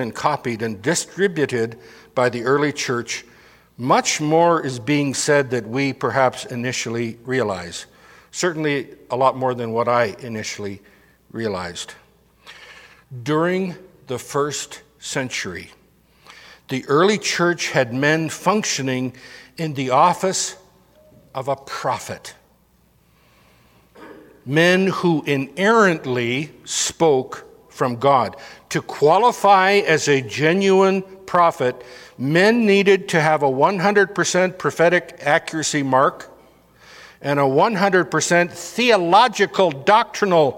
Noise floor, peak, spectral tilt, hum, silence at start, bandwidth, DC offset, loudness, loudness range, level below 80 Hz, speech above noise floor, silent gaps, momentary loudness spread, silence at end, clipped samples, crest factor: -58 dBFS; 0 dBFS; -4 dB/octave; none; 0 s; 16.5 kHz; under 0.1%; -19 LUFS; 9 LU; -62 dBFS; 39 dB; none; 14 LU; 0 s; under 0.1%; 20 dB